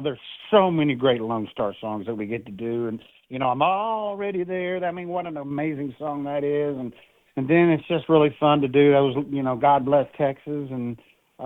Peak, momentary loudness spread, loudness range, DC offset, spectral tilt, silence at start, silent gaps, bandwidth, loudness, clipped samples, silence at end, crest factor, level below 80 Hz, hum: -4 dBFS; 13 LU; 7 LU; under 0.1%; -9.5 dB/octave; 0 s; none; 4 kHz; -23 LUFS; under 0.1%; 0 s; 20 dB; -62 dBFS; none